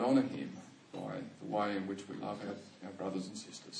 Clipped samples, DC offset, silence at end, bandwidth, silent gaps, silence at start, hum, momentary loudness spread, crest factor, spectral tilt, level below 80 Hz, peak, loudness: under 0.1%; under 0.1%; 0 s; 10 kHz; none; 0 s; none; 13 LU; 18 dB; -5.5 dB/octave; -84 dBFS; -20 dBFS; -39 LUFS